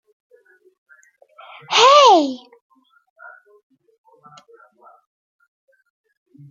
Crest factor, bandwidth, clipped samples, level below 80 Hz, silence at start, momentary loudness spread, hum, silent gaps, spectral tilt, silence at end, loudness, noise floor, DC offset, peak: 20 dB; 7.6 kHz; under 0.1%; -80 dBFS; 1.7 s; 18 LU; none; none; -1.5 dB/octave; 4.15 s; -12 LUFS; -53 dBFS; under 0.1%; -2 dBFS